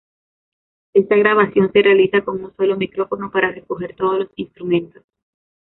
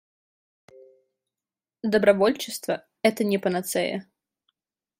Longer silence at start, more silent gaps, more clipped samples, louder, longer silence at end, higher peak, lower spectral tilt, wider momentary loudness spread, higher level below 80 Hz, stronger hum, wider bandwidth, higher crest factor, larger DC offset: second, 0.95 s vs 1.85 s; neither; neither; first, -17 LUFS vs -24 LUFS; second, 0.75 s vs 0.95 s; about the same, -2 dBFS vs -4 dBFS; first, -10.5 dB/octave vs -4.5 dB/octave; first, 14 LU vs 11 LU; first, -58 dBFS vs -70 dBFS; neither; second, 4.1 kHz vs 16 kHz; second, 16 dB vs 22 dB; neither